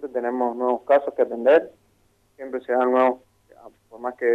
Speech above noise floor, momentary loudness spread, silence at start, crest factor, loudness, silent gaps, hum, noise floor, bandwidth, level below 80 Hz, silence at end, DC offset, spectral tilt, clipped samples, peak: 42 dB; 15 LU; 0 s; 18 dB; -22 LUFS; none; none; -63 dBFS; 4.8 kHz; -70 dBFS; 0 s; under 0.1%; -6 dB/octave; under 0.1%; -4 dBFS